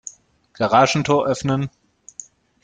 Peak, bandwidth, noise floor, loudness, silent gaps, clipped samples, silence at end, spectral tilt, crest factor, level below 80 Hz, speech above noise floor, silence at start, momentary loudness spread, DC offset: -2 dBFS; 9.4 kHz; -43 dBFS; -18 LUFS; none; under 0.1%; 0.95 s; -5 dB/octave; 18 dB; -54 dBFS; 25 dB; 0.05 s; 22 LU; under 0.1%